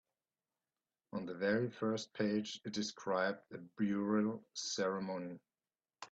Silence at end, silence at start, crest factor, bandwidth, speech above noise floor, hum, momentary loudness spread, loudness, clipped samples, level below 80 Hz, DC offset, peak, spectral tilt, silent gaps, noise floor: 0.05 s; 1.15 s; 18 dB; 8 kHz; over 52 dB; none; 12 LU; -39 LUFS; under 0.1%; -80 dBFS; under 0.1%; -22 dBFS; -4.5 dB/octave; none; under -90 dBFS